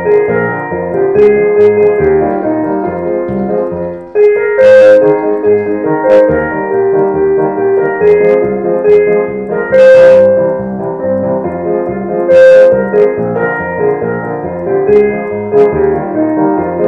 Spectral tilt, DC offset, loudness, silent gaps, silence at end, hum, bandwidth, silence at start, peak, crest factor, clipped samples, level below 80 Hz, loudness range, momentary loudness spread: -8 dB/octave; under 0.1%; -9 LUFS; none; 0 s; none; 6.4 kHz; 0 s; 0 dBFS; 8 dB; 1%; -42 dBFS; 3 LU; 11 LU